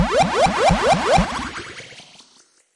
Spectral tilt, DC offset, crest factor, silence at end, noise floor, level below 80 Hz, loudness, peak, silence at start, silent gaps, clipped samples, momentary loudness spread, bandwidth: -4.5 dB/octave; under 0.1%; 16 dB; 0.75 s; -55 dBFS; -34 dBFS; -17 LUFS; -4 dBFS; 0 s; none; under 0.1%; 19 LU; 11.5 kHz